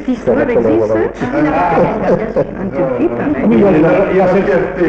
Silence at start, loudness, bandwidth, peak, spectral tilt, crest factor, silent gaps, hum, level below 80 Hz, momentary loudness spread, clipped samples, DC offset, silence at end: 0 s; -13 LUFS; 8 kHz; -2 dBFS; -8.5 dB/octave; 10 dB; none; none; -36 dBFS; 7 LU; under 0.1%; under 0.1%; 0 s